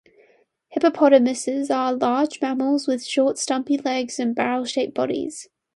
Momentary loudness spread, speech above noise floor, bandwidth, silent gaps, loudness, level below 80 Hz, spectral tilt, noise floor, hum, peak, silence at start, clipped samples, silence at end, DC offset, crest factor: 9 LU; 39 dB; 11.5 kHz; none; -21 LUFS; -70 dBFS; -3.5 dB/octave; -60 dBFS; none; -2 dBFS; 0.7 s; under 0.1%; 0.3 s; under 0.1%; 20 dB